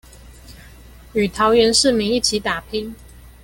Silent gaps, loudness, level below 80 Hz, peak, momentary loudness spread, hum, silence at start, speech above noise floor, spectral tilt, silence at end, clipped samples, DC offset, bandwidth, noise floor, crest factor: none; -17 LUFS; -42 dBFS; -2 dBFS; 14 LU; none; 0.25 s; 25 dB; -3 dB/octave; 0.15 s; under 0.1%; under 0.1%; 17 kHz; -42 dBFS; 18 dB